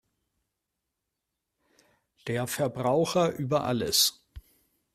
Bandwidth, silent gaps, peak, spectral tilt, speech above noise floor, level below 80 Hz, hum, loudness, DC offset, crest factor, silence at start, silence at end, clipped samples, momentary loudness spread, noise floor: 15.5 kHz; none; -10 dBFS; -3.5 dB/octave; 58 dB; -60 dBFS; none; -26 LUFS; under 0.1%; 20 dB; 2.25 s; 0.55 s; under 0.1%; 9 LU; -84 dBFS